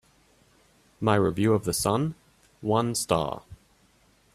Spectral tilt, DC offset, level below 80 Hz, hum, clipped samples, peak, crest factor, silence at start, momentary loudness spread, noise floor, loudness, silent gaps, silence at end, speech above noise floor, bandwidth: -5 dB/octave; under 0.1%; -56 dBFS; none; under 0.1%; -6 dBFS; 22 dB; 1 s; 10 LU; -62 dBFS; -26 LUFS; none; 0.8 s; 38 dB; 15.5 kHz